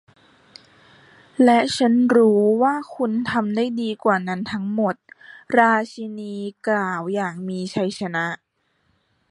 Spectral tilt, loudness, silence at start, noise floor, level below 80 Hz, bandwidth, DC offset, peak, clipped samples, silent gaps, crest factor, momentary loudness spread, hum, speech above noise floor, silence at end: -6 dB/octave; -20 LUFS; 1.4 s; -68 dBFS; -64 dBFS; 11.5 kHz; under 0.1%; -2 dBFS; under 0.1%; none; 20 dB; 14 LU; none; 47 dB; 0.95 s